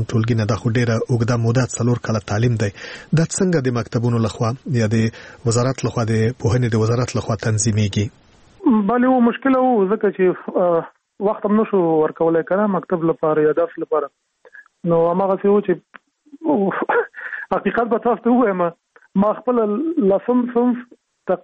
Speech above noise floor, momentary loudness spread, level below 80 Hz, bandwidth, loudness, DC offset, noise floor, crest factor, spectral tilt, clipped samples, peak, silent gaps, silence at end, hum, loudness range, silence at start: 29 dB; 7 LU; -50 dBFS; 8.8 kHz; -19 LUFS; under 0.1%; -46 dBFS; 14 dB; -6.5 dB/octave; under 0.1%; -4 dBFS; none; 0.05 s; none; 2 LU; 0 s